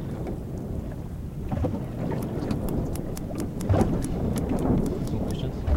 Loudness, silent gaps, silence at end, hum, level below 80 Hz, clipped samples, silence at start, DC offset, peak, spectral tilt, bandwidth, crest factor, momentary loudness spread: -29 LUFS; none; 0 s; none; -34 dBFS; under 0.1%; 0 s; under 0.1%; -8 dBFS; -7.5 dB/octave; 17 kHz; 18 dB; 9 LU